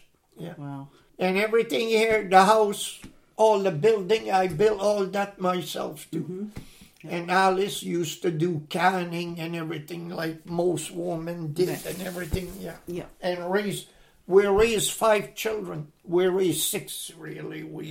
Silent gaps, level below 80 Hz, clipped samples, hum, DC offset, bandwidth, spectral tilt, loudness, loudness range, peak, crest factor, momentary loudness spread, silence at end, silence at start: none; -52 dBFS; under 0.1%; none; under 0.1%; 16.5 kHz; -4.5 dB/octave; -25 LUFS; 8 LU; -4 dBFS; 22 dB; 16 LU; 0 s; 0.35 s